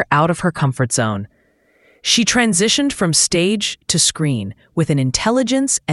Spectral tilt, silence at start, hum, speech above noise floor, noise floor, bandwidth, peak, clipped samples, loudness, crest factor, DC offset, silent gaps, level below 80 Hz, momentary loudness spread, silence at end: -3.5 dB/octave; 0 s; none; 40 dB; -57 dBFS; 12 kHz; 0 dBFS; under 0.1%; -16 LUFS; 18 dB; under 0.1%; none; -46 dBFS; 8 LU; 0 s